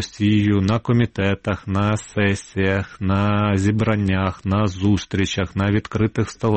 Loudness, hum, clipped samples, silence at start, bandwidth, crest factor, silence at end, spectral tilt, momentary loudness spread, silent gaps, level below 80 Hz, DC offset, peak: -20 LUFS; none; under 0.1%; 0 s; 8.8 kHz; 16 dB; 0 s; -6.5 dB/octave; 4 LU; none; -44 dBFS; 0.4%; -4 dBFS